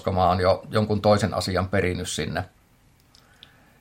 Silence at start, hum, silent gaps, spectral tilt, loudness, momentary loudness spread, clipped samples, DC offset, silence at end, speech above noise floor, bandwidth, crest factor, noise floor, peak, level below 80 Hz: 0.05 s; none; none; -5.5 dB/octave; -23 LUFS; 9 LU; under 0.1%; under 0.1%; 1.35 s; 36 dB; 16.5 kHz; 20 dB; -58 dBFS; -6 dBFS; -54 dBFS